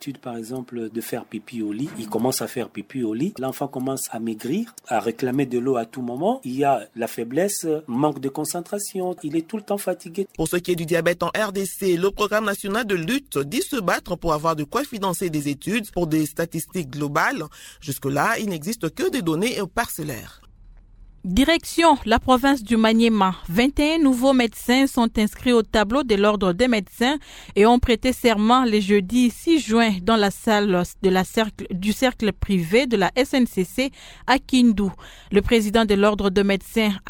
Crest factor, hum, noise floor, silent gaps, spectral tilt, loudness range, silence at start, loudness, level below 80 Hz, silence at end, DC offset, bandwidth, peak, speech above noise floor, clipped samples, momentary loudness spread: 18 dB; none; -47 dBFS; none; -5 dB/octave; 7 LU; 0 s; -22 LUFS; -42 dBFS; 0 s; under 0.1%; 19 kHz; -2 dBFS; 26 dB; under 0.1%; 11 LU